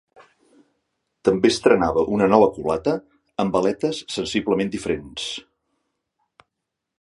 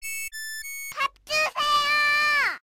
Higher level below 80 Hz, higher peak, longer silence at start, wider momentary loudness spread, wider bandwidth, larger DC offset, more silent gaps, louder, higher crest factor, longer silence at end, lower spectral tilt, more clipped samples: first, -50 dBFS vs -60 dBFS; first, 0 dBFS vs -14 dBFS; first, 1.25 s vs 0 s; about the same, 12 LU vs 13 LU; second, 11.5 kHz vs 17 kHz; neither; neither; about the same, -21 LUFS vs -23 LUFS; first, 22 dB vs 12 dB; first, 1.6 s vs 0.2 s; first, -5 dB/octave vs 1 dB/octave; neither